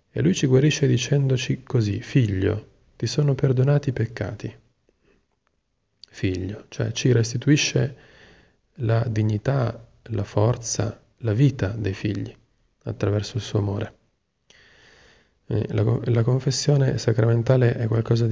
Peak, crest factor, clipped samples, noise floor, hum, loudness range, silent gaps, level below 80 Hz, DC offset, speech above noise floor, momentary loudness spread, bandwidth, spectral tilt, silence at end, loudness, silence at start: -6 dBFS; 18 dB; under 0.1%; -73 dBFS; none; 7 LU; none; -46 dBFS; under 0.1%; 51 dB; 11 LU; 7.8 kHz; -6 dB/octave; 0 s; -23 LUFS; 0.15 s